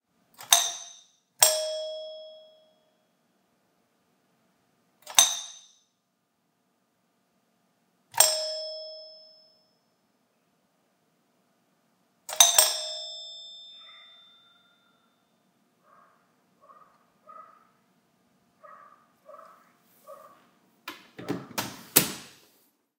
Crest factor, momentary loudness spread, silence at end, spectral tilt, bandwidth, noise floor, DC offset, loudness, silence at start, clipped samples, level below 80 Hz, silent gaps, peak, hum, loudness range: 32 dB; 25 LU; 0.7 s; 0.5 dB/octave; 16 kHz; -75 dBFS; under 0.1%; -23 LUFS; 0.4 s; under 0.1%; -82 dBFS; none; 0 dBFS; none; 18 LU